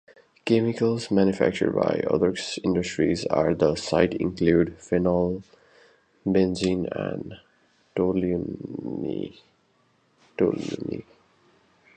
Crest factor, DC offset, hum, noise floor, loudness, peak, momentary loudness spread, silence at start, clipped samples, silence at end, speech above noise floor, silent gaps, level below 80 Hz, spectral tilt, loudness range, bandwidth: 22 dB; under 0.1%; none; -65 dBFS; -25 LUFS; -4 dBFS; 12 LU; 0.45 s; under 0.1%; 0.95 s; 41 dB; none; -50 dBFS; -6.5 dB/octave; 8 LU; 9.4 kHz